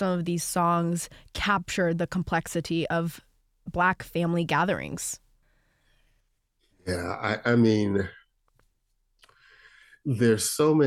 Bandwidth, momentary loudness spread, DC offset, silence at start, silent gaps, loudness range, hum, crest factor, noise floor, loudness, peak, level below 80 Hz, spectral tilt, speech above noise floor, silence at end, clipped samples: 16 kHz; 13 LU; under 0.1%; 0 s; none; 2 LU; none; 18 dB; -72 dBFS; -27 LUFS; -10 dBFS; -52 dBFS; -5 dB/octave; 47 dB; 0 s; under 0.1%